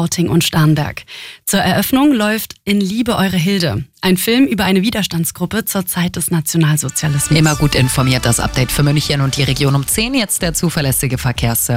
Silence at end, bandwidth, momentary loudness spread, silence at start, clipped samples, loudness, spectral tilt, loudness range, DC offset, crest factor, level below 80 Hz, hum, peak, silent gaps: 0 s; 16.5 kHz; 5 LU; 0 s; under 0.1%; -15 LUFS; -4.5 dB/octave; 1 LU; under 0.1%; 14 dB; -34 dBFS; none; -2 dBFS; none